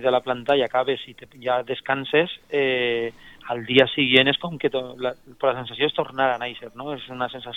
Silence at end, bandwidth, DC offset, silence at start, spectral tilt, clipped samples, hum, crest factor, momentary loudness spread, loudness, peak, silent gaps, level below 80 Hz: 0 s; 9.6 kHz; under 0.1%; 0 s; -6 dB/octave; under 0.1%; none; 22 dB; 15 LU; -23 LUFS; -2 dBFS; none; -60 dBFS